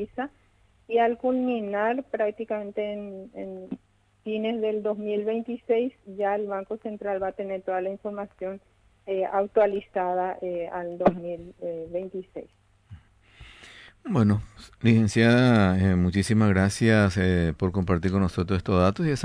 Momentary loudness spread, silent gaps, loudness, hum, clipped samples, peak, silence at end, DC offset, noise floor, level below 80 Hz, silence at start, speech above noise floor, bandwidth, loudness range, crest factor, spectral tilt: 16 LU; none; -25 LUFS; none; under 0.1%; -8 dBFS; 0 s; under 0.1%; -52 dBFS; -50 dBFS; 0 s; 27 dB; 11 kHz; 10 LU; 18 dB; -7 dB/octave